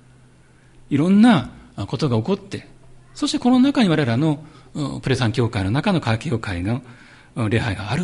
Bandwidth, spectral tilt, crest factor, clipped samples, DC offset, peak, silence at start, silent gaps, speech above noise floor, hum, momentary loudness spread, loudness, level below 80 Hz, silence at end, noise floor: 11.5 kHz; -6.5 dB/octave; 18 dB; under 0.1%; under 0.1%; -4 dBFS; 0.9 s; none; 32 dB; none; 14 LU; -20 LUFS; -44 dBFS; 0 s; -51 dBFS